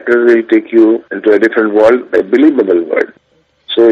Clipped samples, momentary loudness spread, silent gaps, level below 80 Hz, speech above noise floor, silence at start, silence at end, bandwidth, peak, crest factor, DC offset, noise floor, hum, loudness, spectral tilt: 0.3%; 7 LU; none; -56 dBFS; 46 dB; 0.05 s; 0 s; 6.2 kHz; 0 dBFS; 10 dB; under 0.1%; -55 dBFS; none; -10 LUFS; -6 dB/octave